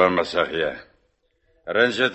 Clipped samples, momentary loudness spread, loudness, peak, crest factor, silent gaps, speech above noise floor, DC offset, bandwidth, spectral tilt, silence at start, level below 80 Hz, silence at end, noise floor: under 0.1%; 18 LU; -22 LUFS; -4 dBFS; 20 dB; none; 45 dB; under 0.1%; 8.4 kHz; -4.5 dB/octave; 0 s; -56 dBFS; 0 s; -67 dBFS